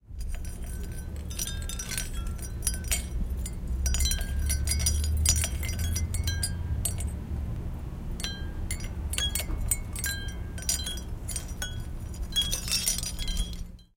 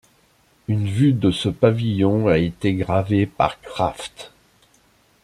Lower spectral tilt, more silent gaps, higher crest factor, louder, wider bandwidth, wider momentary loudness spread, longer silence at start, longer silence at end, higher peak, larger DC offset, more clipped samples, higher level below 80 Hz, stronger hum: second, -2.5 dB/octave vs -7.5 dB/octave; neither; first, 24 dB vs 18 dB; second, -31 LUFS vs -20 LUFS; first, 17 kHz vs 12.5 kHz; about the same, 12 LU vs 10 LU; second, 0.1 s vs 0.7 s; second, 0.15 s vs 0.95 s; second, -6 dBFS vs -2 dBFS; neither; neither; first, -32 dBFS vs -48 dBFS; neither